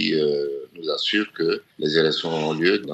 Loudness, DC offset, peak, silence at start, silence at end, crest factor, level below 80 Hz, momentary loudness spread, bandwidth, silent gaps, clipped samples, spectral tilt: -23 LUFS; under 0.1%; -4 dBFS; 0 s; 0 s; 18 dB; -70 dBFS; 7 LU; 8.2 kHz; none; under 0.1%; -5 dB/octave